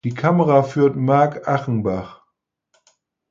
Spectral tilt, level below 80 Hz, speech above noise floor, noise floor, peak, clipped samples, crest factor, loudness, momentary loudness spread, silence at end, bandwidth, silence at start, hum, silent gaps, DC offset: -8.5 dB/octave; -54 dBFS; 57 dB; -74 dBFS; -2 dBFS; under 0.1%; 18 dB; -18 LUFS; 9 LU; 1.15 s; 7.4 kHz; 0.05 s; none; none; under 0.1%